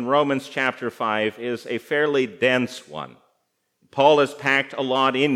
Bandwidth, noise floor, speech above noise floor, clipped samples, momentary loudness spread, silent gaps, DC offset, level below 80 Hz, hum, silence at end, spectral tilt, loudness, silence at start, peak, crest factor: 14.5 kHz; -72 dBFS; 51 dB; under 0.1%; 14 LU; none; under 0.1%; -76 dBFS; none; 0 s; -5 dB/octave; -21 LUFS; 0 s; -2 dBFS; 20 dB